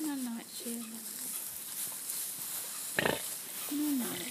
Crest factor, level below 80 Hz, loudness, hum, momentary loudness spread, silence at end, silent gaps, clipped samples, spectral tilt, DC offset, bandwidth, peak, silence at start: 24 dB; -72 dBFS; -36 LUFS; none; 7 LU; 0 s; none; under 0.1%; -2 dB/octave; under 0.1%; 15.5 kHz; -14 dBFS; 0 s